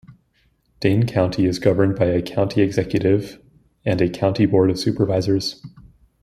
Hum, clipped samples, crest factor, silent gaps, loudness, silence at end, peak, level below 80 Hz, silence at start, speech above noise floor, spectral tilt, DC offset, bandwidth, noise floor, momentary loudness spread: none; under 0.1%; 18 dB; none; -20 LUFS; 0.4 s; -2 dBFS; -48 dBFS; 0.1 s; 44 dB; -7 dB/octave; under 0.1%; 14 kHz; -63 dBFS; 6 LU